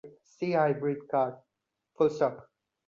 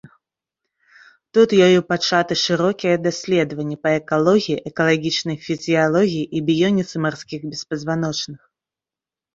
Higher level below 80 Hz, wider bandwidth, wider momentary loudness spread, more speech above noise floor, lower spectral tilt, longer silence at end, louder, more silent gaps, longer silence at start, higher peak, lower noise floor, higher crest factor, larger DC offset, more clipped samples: second, -74 dBFS vs -60 dBFS; about the same, 7.4 kHz vs 7.8 kHz; second, 7 LU vs 10 LU; second, 47 dB vs 71 dB; first, -7.5 dB/octave vs -5 dB/octave; second, 0.45 s vs 1 s; second, -29 LUFS vs -19 LUFS; neither; second, 0.05 s vs 1.35 s; second, -14 dBFS vs -2 dBFS; second, -75 dBFS vs -89 dBFS; about the same, 18 dB vs 18 dB; neither; neither